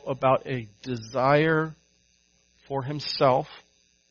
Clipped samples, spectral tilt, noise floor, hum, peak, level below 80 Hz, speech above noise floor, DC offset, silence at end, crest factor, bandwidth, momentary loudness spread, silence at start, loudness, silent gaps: under 0.1%; -4.5 dB/octave; -65 dBFS; none; -6 dBFS; -62 dBFS; 41 dB; under 0.1%; 0.5 s; 20 dB; 7 kHz; 13 LU; 0.05 s; -25 LUFS; none